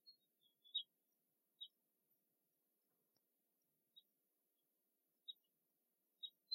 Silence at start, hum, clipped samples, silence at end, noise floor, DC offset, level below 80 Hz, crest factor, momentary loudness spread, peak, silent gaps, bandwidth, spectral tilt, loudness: 0.05 s; none; under 0.1%; 0 s; -88 dBFS; under 0.1%; under -90 dBFS; 26 dB; 13 LU; -34 dBFS; none; 16 kHz; 0.5 dB/octave; -53 LUFS